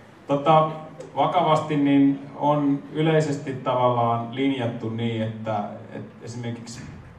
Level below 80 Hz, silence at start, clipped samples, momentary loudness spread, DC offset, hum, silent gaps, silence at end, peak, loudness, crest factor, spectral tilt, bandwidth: -64 dBFS; 0.3 s; under 0.1%; 17 LU; under 0.1%; none; none; 0.05 s; -4 dBFS; -23 LUFS; 20 dB; -7 dB/octave; 9.6 kHz